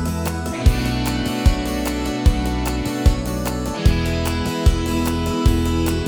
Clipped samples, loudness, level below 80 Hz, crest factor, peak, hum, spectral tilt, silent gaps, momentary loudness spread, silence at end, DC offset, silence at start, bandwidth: under 0.1%; -20 LUFS; -22 dBFS; 18 dB; 0 dBFS; none; -5.5 dB/octave; none; 4 LU; 0 s; under 0.1%; 0 s; over 20 kHz